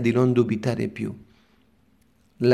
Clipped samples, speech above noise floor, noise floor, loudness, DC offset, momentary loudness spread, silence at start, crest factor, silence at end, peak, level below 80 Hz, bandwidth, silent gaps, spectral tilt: under 0.1%; 39 dB; -62 dBFS; -24 LUFS; under 0.1%; 13 LU; 0 s; 20 dB; 0 s; -4 dBFS; -62 dBFS; 12.5 kHz; none; -8 dB/octave